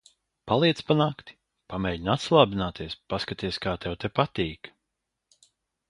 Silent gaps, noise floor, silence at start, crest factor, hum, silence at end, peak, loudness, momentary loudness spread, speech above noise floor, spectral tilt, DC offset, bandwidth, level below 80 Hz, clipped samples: none; -83 dBFS; 0.45 s; 24 dB; none; 1.2 s; -2 dBFS; -26 LUFS; 15 LU; 57 dB; -6 dB/octave; under 0.1%; 11 kHz; -50 dBFS; under 0.1%